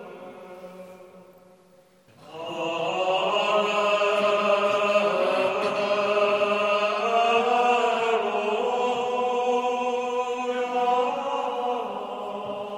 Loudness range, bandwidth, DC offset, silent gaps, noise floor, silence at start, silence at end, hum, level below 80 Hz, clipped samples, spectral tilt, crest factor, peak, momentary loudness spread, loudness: 5 LU; 13 kHz; under 0.1%; none; -57 dBFS; 0 s; 0 s; none; -76 dBFS; under 0.1%; -3.5 dB/octave; 16 dB; -10 dBFS; 11 LU; -24 LUFS